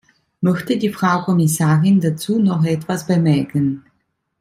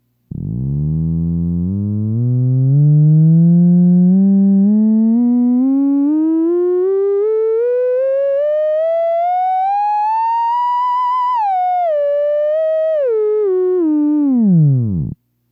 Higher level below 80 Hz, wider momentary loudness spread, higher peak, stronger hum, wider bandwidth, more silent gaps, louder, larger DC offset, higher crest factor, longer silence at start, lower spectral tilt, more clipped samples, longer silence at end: second, -58 dBFS vs -44 dBFS; about the same, 6 LU vs 8 LU; first, -2 dBFS vs -6 dBFS; second, none vs 60 Hz at -35 dBFS; first, 15.5 kHz vs 5 kHz; neither; second, -17 LUFS vs -14 LUFS; neither; first, 16 dB vs 8 dB; about the same, 0.4 s vs 0.35 s; second, -6.5 dB/octave vs -12 dB/octave; neither; first, 0.6 s vs 0.35 s